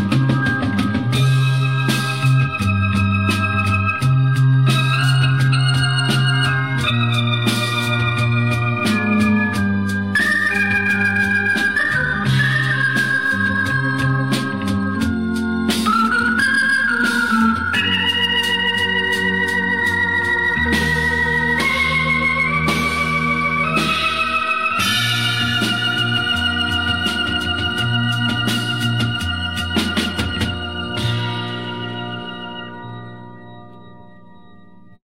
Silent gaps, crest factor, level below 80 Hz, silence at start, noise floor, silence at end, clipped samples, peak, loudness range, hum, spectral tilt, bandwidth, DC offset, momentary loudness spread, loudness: none; 14 dB; -40 dBFS; 0 s; -46 dBFS; 1.1 s; under 0.1%; -4 dBFS; 5 LU; none; -5 dB/octave; 16 kHz; 0.7%; 5 LU; -17 LUFS